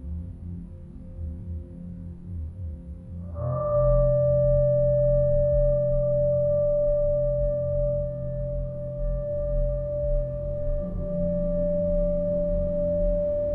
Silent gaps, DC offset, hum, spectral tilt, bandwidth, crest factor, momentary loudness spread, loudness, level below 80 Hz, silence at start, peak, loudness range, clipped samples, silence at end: none; under 0.1%; none; -13 dB/octave; 1.9 kHz; 14 dB; 16 LU; -25 LUFS; -32 dBFS; 0 s; -10 dBFS; 7 LU; under 0.1%; 0 s